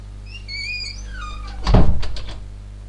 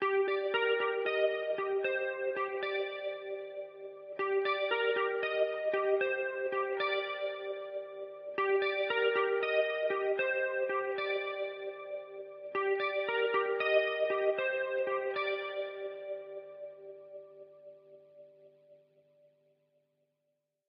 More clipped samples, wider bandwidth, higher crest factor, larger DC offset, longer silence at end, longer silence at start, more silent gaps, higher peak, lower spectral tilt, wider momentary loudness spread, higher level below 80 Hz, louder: neither; first, 9 kHz vs 5.6 kHz; about the same, 18 dB vs 18 dB; neither; second, 0 s vs 1.95 s; about the same, 0 s vs 0 s; neither; first, 0 dBFS vs -16 dBFS; first, -6 dB/octave vs 0.5 dB/octave; first, 18 LU vs 14 LU; first, -24 dBFS vs under -90 dBFS; first, -24 LUFS vs -33 LUFS